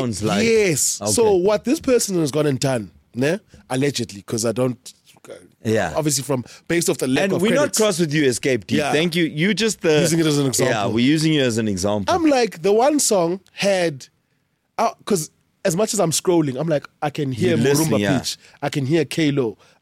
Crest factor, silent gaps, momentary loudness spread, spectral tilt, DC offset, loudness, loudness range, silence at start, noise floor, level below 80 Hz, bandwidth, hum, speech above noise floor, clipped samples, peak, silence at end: 12 dB; none; 9 LU; -4.5 dB/octave; under 0.1%; -19 LUFS; 5 LU; 0 s; -68 dBFS; -54 dBFS; 16.5 kHz; none; 49 dB; under 0.1%; -6 dBFS; 0.25 s